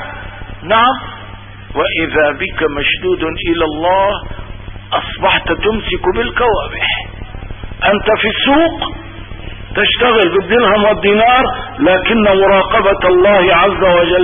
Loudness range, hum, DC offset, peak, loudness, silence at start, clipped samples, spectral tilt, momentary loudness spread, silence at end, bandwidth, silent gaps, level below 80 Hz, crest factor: 5 LU; none; under 0.1%; 0 dBFS; -12 LUFS; 0 s; under 0.1%; -9 dB/octave; 20 LU; 0 s; 3.7 kHz; none; -30 dBFS; 12 dB